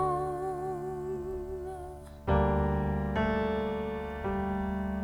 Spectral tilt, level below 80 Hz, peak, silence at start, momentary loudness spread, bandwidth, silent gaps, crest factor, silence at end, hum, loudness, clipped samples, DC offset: -8 dB/octave; -40 dBFS; -14 dBFS; 0 s; 11 LU; 13.5 kHz; none; 18 dB; 0 s; none; -32 LUFS; under 0.1%; under 0.1%